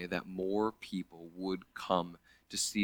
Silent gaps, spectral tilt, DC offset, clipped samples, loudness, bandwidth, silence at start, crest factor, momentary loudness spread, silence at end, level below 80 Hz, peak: none; -3.5 dB/octave; under 0.1%; under 0.1%; -37 LUFS; over 20 kHz; 0 s; 22 dB; 8 LU; 0 s; -66 dBFS; -14 dBFS